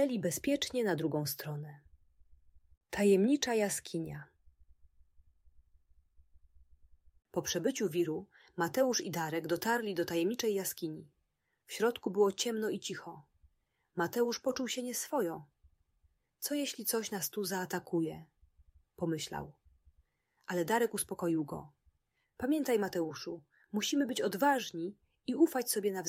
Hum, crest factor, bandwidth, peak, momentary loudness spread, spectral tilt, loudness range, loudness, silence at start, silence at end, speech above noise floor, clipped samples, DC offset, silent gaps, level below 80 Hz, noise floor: none; 20 dB; 16 kHz; -16 dBFS; 14 LU; -4 dB/octave; 5 LU; -34 LUFS; 0 s; 0 s; 47 dB; under 0.1%; under 0.1%; 2.77-2.81 s; -70 dBFS; -81 dBFS